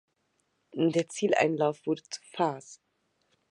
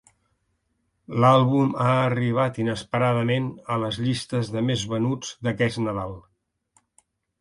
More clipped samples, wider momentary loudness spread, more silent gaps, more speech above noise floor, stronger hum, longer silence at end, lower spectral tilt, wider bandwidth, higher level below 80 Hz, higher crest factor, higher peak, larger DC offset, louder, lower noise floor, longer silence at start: neither; first, 14 LU vs 10 LU; neither; about the same, 47 dB vs 50 dB; neither; second, 0.75 s vs 1.2 s; second, -5 dB/octave vs -6.5 dB/octave; about the same, 11 kHz vs 11.5 kHz; second, -82 dBFS vs -56 dBFS; about the same, 20 dB vs 20 dB; second, -10 dBFS vs -4 dBFS; neither; second, -29 LUFS vs -23 LUFS; about the same, -76 dBFS vs -73 dBFS; second, 0.75 s vs 1.1 s